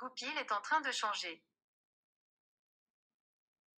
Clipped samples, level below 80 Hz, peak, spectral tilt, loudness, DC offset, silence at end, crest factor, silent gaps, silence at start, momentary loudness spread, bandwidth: under 0.1%; under -90 dBFS; -20 dBFS; 0.5 dB/octave; -37 LUFS; under 0.1%; 2.4 s; 22 dB; none; 0 s; 10 LU; 16 kHz